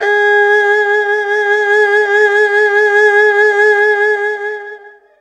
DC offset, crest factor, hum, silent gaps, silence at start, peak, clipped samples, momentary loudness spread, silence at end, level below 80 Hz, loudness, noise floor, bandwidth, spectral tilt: under 0.1%; 12 dB; none; none; 0 s; 0 dBFS; under 0.1%; 8 LU; 0.3 s; -66 dBFS; -10 LUFS; -35 dBFS; 9 kHz; -0.5 dB/octave